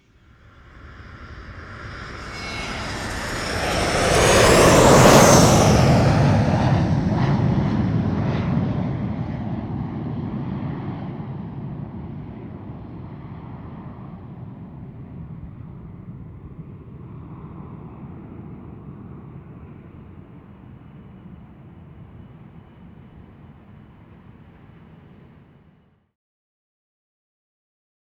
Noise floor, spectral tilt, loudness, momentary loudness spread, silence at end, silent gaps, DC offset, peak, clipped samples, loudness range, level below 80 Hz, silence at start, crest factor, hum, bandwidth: -57 dBFS; -5 dB/octave; -18 LUFS; 26 LU; 4.7 s; none; under 0.1%; 0 dBFS; under 0.1%; 25 LU; -38 dBFS; 0.85 s; 22 dB; none; over 20 kHz